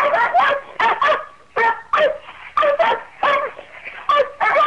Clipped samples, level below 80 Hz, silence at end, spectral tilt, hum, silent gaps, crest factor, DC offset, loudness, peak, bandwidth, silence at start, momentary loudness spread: under 0.1%; -56 dBFS; 0 s; -3 dB/octave; none; none; 12 dB; 0.3%; -18 LUFS; -6 dBFS; 9.8 kHz; 0 s; 12 LU